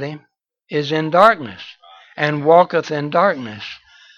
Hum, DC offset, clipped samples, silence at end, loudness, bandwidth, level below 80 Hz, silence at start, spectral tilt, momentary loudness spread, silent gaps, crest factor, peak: none; under 0.1%; under 0.1%; 0.4 s; -16 LUFS; 9.4 kHz; -64 dBFS; 0 s; -6 dB/octave; 24 LU; none; 18 dB; 0 dBFS